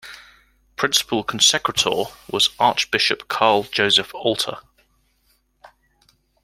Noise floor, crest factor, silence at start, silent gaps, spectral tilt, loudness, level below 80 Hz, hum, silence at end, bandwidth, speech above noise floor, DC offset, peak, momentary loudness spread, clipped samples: -64 dBFS; 22 dB; 0.05 s; none; -1.5 dB/octave; -18 LUFS; -58 dBFS; none; 0.75 s; 16.5 kHz; 44 dB; under 0.1%; 0 dBFS; 11 LU; under 0.1%